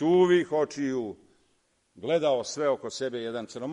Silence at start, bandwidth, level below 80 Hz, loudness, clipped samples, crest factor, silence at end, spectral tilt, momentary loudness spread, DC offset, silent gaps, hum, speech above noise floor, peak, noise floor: 0 s; 10.5 kHz; -72 dBFS; -27 LUFS; under 0.1%; 16 dB; 0 s; -5.5 dB/octave; 13 LU; under 0.1%; none; none; 44 dB; -10 dBFS; -70 dBFS